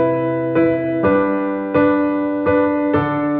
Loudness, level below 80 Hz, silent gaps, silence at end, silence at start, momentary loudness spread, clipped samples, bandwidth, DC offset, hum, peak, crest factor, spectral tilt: -17 LUFS; -48 dBFS; none; 0 s; 0 s; 3 LU; under 0.1%; 4.3 kHz; under 0.1%; none; -2 dBFS; 14 dB; -11 dB/octave